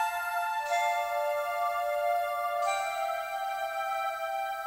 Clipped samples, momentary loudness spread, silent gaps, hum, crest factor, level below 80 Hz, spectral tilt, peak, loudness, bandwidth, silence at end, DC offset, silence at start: under 0.1%; 4 LU; none; none; 14 dB; -72 dBFS; 1 dB/octave; -18 dBFS; -31 LUFS; 16 kHz; 0 s; under 0.1%; 0 s